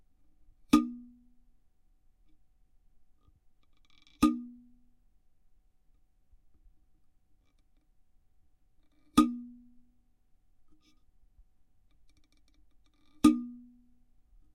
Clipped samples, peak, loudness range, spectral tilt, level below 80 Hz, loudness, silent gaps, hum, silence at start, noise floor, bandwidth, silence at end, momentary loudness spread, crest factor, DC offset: under 0.1%; -8 dBFS; 3 LU; -5 dB/octave; -60 dBFS; -29 LUFS; none; none; 0.75 s; -67 dBFS; 16 kHz; 1 s; 22 LU; 28 dB; under 0.1%